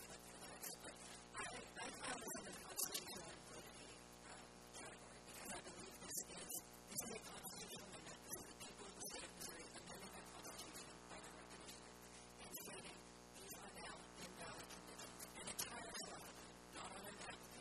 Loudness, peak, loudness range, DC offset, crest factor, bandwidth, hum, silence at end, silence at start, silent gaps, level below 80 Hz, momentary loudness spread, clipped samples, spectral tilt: -52 LUFS; -30 dBFS; 6 LU; under 0.1%; 26 dB; 14 kHz; 60 Hz at -70 dBFS; 0 s; 0 s; none; -74 dBFS; 9 LU; under 0.1%; -2 dB/octave